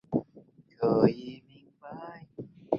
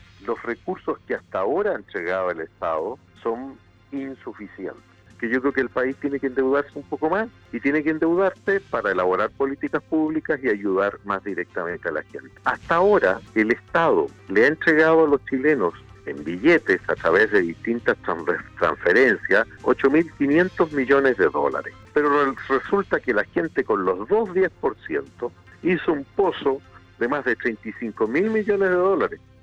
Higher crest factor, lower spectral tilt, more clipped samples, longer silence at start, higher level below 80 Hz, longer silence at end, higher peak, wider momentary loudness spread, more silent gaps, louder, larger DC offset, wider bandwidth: first, 26 dB vs 14 dB; first, -10 dB/octave vs -7 dB/octave; neither; about the same, 0.1 s vs 0.2 s; second, -64 dBFS vs -56 dBFS; second, 0 s vs 0.25 s; about the same, -6 dBFS vs -8 dBFS; first, 23 LU vs 13 LU; neither; second, -28 LUFS vs -22 LUFS; neither; second, 6.6 kHz vs 8 kHz